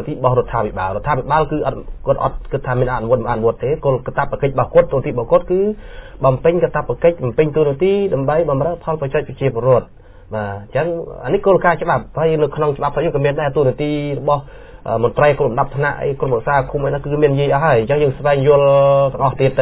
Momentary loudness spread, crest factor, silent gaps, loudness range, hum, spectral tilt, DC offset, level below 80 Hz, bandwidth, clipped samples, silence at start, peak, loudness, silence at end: 7 LU; 16 dB; none; 3 LU; none; -11.5 dB/octave; under 0.1%; -36 dBFS; 4 kHz; under 0.1%; 0 s; 0 dBFS; -17 LUFS; 0 s